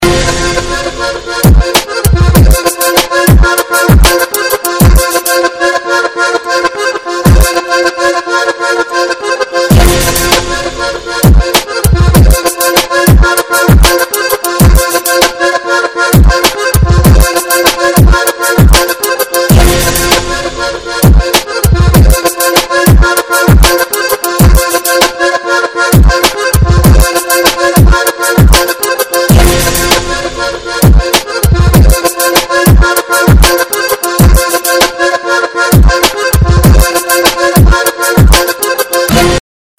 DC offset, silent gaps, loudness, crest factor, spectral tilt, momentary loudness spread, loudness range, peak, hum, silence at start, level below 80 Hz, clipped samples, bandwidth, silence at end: under 0.1%; none; -8 LUFS; 6 dB; -4.5 dB/octave; 5 LU; 2 LU; 0 dBFS; none; 0 s; -12 dBFS; 3%; over 20 kHz; 0.4 s